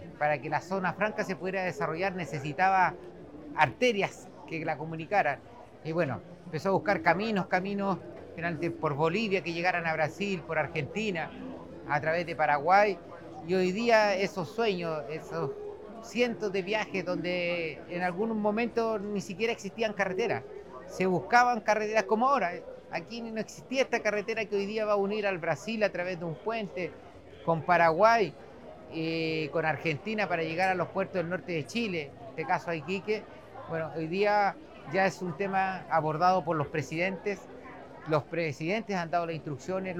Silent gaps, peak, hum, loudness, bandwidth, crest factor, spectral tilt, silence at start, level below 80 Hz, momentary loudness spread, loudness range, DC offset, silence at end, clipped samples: none; -8 dBFS; none; -30 LUFS; 16 kHz; 22 dB; -5.5 dB/octave; 0 s; -64 dBFS; 14 LU; 4 LU; 0.1%; 0 s; under 0.1%